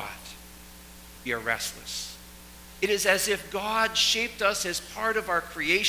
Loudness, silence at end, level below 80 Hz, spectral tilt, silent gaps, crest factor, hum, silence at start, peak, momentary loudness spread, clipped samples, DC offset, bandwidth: -26 LUFS; 0 s; -52 dBFS; -1 dB/octave; none; 24 dB; none; 0 s; -6 dBFS; 23 LU; under 0.1%; under 0.1%; 16 kHz